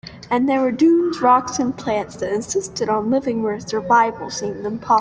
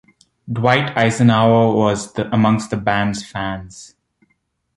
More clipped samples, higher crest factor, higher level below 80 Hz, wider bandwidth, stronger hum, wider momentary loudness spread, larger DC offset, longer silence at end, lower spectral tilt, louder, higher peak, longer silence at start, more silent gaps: neither; about the same, 16 dB vs 16 dB; second, -54 dBFS vs -48 dBFS; second, 10 kHz vs 11.5 kHz; neither; second, 9 LU vs 12 LU; neither; second, 0 s vs 0.9 s; second, -4.5 dB/octave vs -6 dB/octave; about the same, -19 LUFS vs -17 LUFS; second, -4 dBFS vs 0 dBFS; second, 0.05 s vs 0.45 s; neither